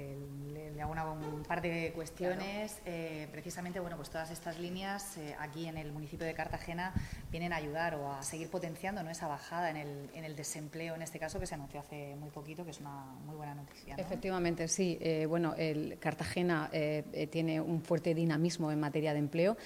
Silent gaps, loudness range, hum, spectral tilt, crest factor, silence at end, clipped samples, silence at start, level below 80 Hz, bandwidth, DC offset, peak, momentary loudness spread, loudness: none; 8 LU; none; -5.5 dB/octave; 16 dB; 0 s; under 0.1%; 0 s; -58 dBFS; 16 kHz; under 0.1%; -20 dBFS; 12 LU; -38 LUFS